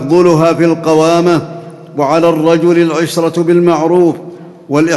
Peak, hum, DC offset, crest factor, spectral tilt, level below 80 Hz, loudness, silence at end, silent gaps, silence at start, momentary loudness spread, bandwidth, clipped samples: 0 dBFS; none; under 0.1%; 10 dB; -6.5 dB/octave; -54 dBFS; -10 LUFS; 0 s; none; 0 s; 12 LU; 12.5 kHz; 0.3%